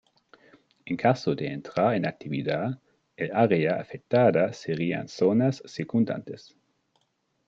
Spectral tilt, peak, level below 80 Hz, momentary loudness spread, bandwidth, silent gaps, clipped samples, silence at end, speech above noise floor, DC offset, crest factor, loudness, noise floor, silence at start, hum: -7.5 dB/octave; -8 dBFS; -68 dBFS; 12 LU; 7.6 kHz; none; under 0.1%; 1.1 s; 48 dB; under 0.1%; 20 dB; -26 LUFS; -73 dBFS; 0.85 s; none